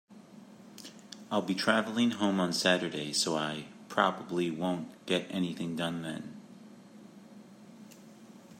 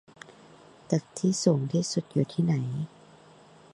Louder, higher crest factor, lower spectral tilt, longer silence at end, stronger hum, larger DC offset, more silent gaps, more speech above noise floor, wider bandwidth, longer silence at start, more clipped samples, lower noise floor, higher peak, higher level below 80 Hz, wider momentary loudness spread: second, -31 LUFS vs -28 LUFS; about the same, 24 dB vs 22 dB; second, -4 dB/octave vs -6 dB/octave; second, 0 s vs 0.85 s; neither; neither; neither; second, 22 dB vs 27 dB; first, 16 kHz vs 11.5 kHz; second, 0.1 s vs 0.3 s; neither; about the same, -53 dBFS vs -54 dBFS; about the same, -8 dBFS vs -8 dBFS; second, -78 dBFS vs -68 dBFS; first, 25 LU vs 13 LU